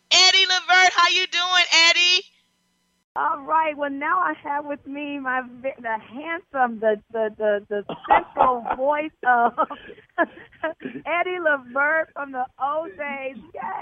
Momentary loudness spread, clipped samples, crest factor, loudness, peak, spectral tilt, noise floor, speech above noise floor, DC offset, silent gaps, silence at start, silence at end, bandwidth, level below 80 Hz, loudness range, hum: 17 LU; under 0.1%; 20 dB; -20 LUFS; -2 dBFS; -0.5 dB/octave; -69 dBFS; 44 dB; under 0.1%; 3.04-3.15 s; 0.1 s; 0 s; 8.2 kHz; -60 dBFS; 8 LU; none